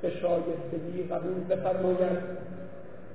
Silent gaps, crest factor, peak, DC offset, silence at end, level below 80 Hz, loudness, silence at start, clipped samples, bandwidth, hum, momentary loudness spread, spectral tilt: none; 16 dB; -16 dBFS; 0.8%; 0 s; -66 dBFS; -31 LUFS; 0 s; under 0.1%; 4 kHz; none; 16 LU; -11.5 dB/octave